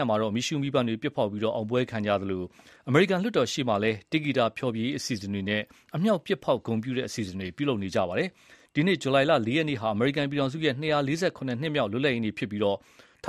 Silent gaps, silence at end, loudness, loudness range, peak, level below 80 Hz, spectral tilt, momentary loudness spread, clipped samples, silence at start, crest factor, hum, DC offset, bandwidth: none; 0 s; -27 LUFS; 3 LU; -8 dBFS; -64 dBFS; -5.5 dB/octave; 8 LU; under 0.1%; 0 s; 20 dB; none; under 0.1%; 14 kHz